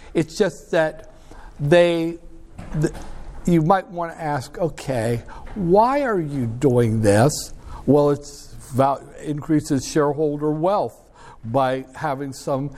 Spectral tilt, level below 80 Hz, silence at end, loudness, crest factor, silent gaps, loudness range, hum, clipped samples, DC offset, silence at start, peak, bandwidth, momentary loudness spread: -6.5 dB/octave; -42 dBFS; 0 s; -21 LUFS; 18 dB; none; 4 LU; none; under 0.1%; under 0.1%; 0 s; -2 dBFS; 15 kHz; 13 LU